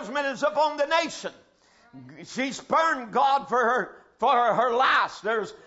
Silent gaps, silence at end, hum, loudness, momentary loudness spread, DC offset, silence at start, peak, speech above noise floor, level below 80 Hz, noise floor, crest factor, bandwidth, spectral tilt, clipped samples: none; 0.1 s; none; -24 LUFS; 12 LU; under 0.1%; 0 s; -8 dBFS; 34 dB; -68 dBFS; -58 dBFS; 16 dB; 8 kHz; -3 dB/octave; under 0.1%